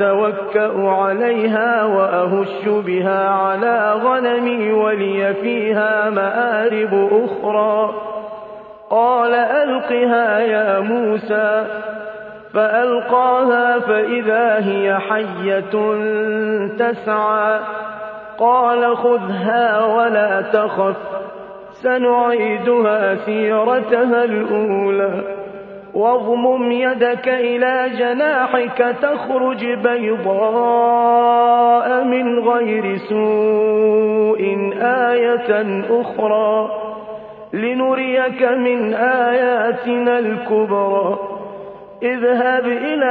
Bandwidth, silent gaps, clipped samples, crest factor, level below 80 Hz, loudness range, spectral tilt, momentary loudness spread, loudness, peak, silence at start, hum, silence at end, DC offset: 4.7 kHz; none; under 0.1%; 14 dB; -64 dBFS; 3 LU; -8.5 dB/octave; 9 LU; -16 LUFS; -2 dBFS; 0 s; none; 0 s; under 0.1%